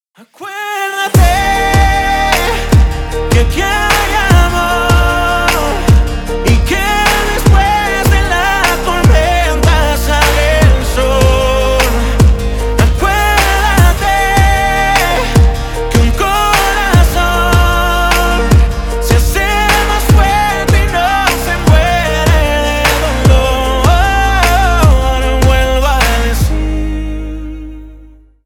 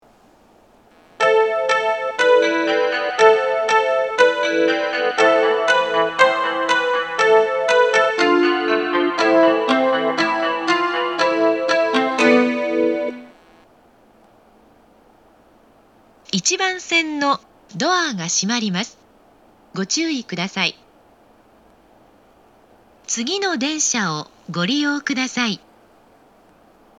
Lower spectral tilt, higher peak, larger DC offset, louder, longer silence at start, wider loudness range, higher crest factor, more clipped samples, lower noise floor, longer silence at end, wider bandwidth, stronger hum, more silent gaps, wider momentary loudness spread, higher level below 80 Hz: first, -4.5 dB/octave vs -3 dB/octave; about the same, 0 dBFS vs 0 dBFS; neither; first, -11 LUFS vs -18 LUFS; second, 0.4 s vs 1.2 s; second, 1 LU vs 9 LU; second, 10 dB vs 20 dB; neither; second, -38 dBFS vs -52 dBFS; second, 0.4 s vs 1.4 s; first, 18.5 kHz vs 10 kHz; neither; neither; second, 5 LU vs 9 LU; first, -14 dBFS vs -66 dBFS